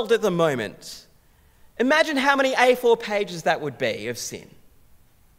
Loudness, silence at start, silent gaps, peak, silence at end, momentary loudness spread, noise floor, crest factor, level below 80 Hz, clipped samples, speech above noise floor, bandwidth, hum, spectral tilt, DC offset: -22 LUFS; 0 s; none; -2 dBFS; 0.95 s; 16 LU; -56 dBFS; 20 dB; -60 dBFS; under 0.1%; 34 dB; 16 kHz; none; -4 dB/octave; under 0.1%